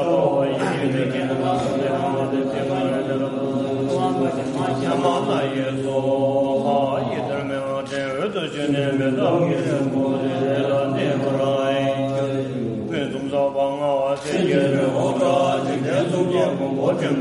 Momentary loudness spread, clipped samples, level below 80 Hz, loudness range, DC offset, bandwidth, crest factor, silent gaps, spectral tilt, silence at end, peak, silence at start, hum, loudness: 5 LU; under 0.1%; -58 dBFS; 2 LU; under 0.1%; 11.5 kHz; 14 dB; none; -6.5 dB/octave; 0 s; -6 dBFS; 0 s; none; -21 LUFS